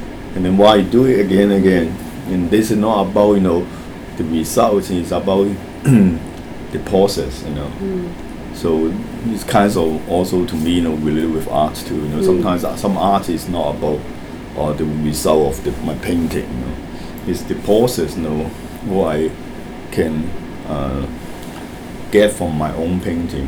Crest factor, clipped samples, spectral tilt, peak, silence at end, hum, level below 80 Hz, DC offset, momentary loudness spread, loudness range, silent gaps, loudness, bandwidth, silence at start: 16 dB; under 0.1%; -6 dB/octave; 0 dBFS; 0 s; none; -34 dBFS; under 0.1%; 15 LU; 5 LU; none; -17 LUFS; over 20 kHz; 0 s